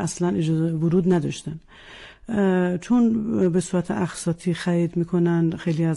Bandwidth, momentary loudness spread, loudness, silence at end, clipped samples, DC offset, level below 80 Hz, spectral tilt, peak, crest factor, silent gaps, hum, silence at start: 11.5 kHz; 12 LU; -22 LUFS; 0 s; under 0.1%; under 0.1%; -52 dBFS; -7 dB/octave; -10 dBFS; 12 dB; none; none; 0 s